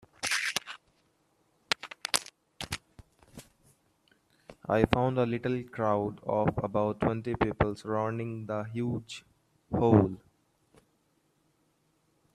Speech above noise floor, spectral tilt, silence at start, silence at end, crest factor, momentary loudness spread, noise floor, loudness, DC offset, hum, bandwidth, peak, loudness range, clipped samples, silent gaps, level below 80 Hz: 43 dB; -5 dB/octave; 0.2 s; 2.2 s; 28 dB; 15 LU; -72 dBFS; -30 LUFS; under 0.1%; none; 14.5 kHz; -4 dBFS; 7 LU; under 0.1%; none; -54 dBFS